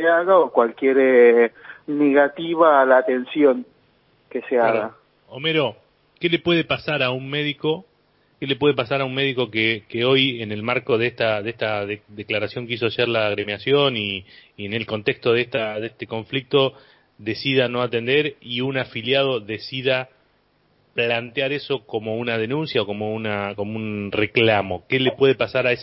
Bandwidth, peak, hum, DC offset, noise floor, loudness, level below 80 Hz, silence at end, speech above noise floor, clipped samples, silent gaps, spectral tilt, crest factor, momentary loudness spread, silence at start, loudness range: 5.8 kHz; -2 dBFS; none; under 0.1%; -62 dBFS; -21 LUFS; -58 dBFS; 0 s; 42 dB; under 0.1%; none; -10 dB/octave; 18 dB; 11 LU; 0 s; 6 LU